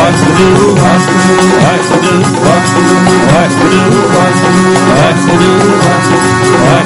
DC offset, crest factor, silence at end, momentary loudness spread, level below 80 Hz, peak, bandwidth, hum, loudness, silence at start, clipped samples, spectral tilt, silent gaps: under 0.1%; 6 dB; 0 s; 2 LU; -36 dBFS; 0 dBFS; 11.5 kHz; none; -7 LUFS; 0 s; 0.5%; -5 dB/octave; none